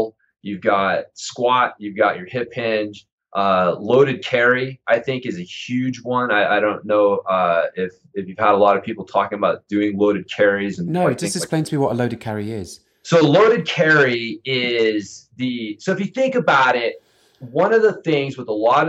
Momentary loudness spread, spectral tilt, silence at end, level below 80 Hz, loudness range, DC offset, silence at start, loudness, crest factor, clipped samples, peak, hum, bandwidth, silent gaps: 12 LU; -5 dB/octave; 0 s; -64 dBFS; 3 LU; under 0.1%; 0 s; -19 LUFS; 18 dB; under 0.1%; -2 dBFS; none; 13.5 kHz; 3.12-3.18 s